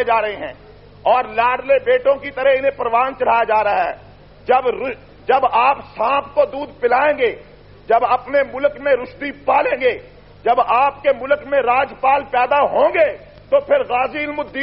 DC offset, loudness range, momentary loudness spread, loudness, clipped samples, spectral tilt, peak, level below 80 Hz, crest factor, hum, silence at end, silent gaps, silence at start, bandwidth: under 0.1%; 2 LU; 9 LU; -17 LUFS; under 0.1%; -1.5 dB/octave; -4 dBFS; -48 dBFS; 14 dB; 50 Hz at -50 dBFS; 0 s; none; 0 s; 5.6 kHz